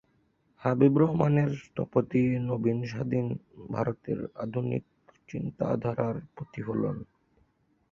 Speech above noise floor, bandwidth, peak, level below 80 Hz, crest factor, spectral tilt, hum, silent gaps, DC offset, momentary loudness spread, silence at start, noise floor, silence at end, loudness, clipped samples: 41 dB; 7.2 kHz; -8 dBFS; -60 dBFS; 22 dB; -9.5 dB/octave; none; none; under 0.1%; 13 LU; 0.6 s; -69 dBFS; 0.9 s; -29 LUFS; under 0.1%